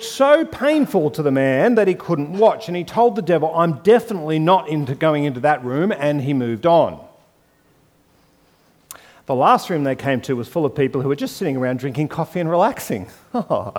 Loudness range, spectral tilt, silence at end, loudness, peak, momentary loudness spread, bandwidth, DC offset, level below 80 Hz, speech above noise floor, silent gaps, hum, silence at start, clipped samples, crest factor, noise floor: 5 LU; -6.5 dB/octave; 0 s; -18 LUFS; -2 dBFS; 8 LU; 18 kHz; under 0.1%; -58 dBFS; 39 dB; none; none; 0 s; under 0.1%; 16 dB; -57 dBFS